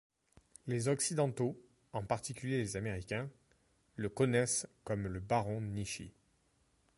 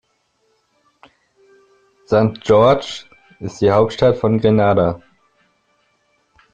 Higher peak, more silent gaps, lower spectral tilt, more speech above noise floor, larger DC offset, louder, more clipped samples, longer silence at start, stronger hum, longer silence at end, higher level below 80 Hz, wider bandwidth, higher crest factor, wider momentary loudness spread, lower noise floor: second, -18 dBFS vs -2 dBFS; neither; second, -5 dB/octave vs -7 dB/octave; second, 38 dB vs 50 dB; neither; second, -37 LUFS vs -15 LUFS; neither; second, 0.65 s vs 2.1 s; neither; second, 0.9 s vs 1.55 s; second, -62 dBFS vs -48 dBFS; first, 11.5 kHz vs 8.8 kHz; about the same, 20 dB vs 16 dB; second, 13 LU vs 19 LU; first, -74 dBFS vs -64 dBFS